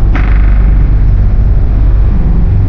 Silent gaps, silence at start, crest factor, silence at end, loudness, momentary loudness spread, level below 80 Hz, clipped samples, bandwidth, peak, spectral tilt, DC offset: none; 0 s; 6 dB; 0 s; -11 LUFS; 1 LU; -6 dBFS; under 0.1%; 3.6 kHz; 0 dBFS; -9 dB/octave; under 0.1%